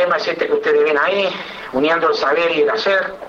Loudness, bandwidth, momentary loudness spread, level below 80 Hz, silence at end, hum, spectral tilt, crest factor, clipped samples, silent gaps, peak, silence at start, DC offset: -16 LUFS; 7.4 kHz; 5 LU; -56 dBFS; 0 s; none; -4 dB/octave; 12 dB; under 0.1%; none; -6 dBFS; 0 s; under 0.1%